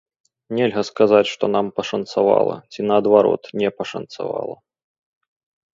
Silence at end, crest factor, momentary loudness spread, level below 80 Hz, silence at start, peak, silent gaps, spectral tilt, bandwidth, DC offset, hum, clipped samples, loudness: 1.2 s; 20 dB; 13 LU; -64 dBFS; 0.5 s; 0 dBFS; none; -6 dB/octave; 7.6 kHz; under 0.1%; none; under 0.1%; -19 LUFS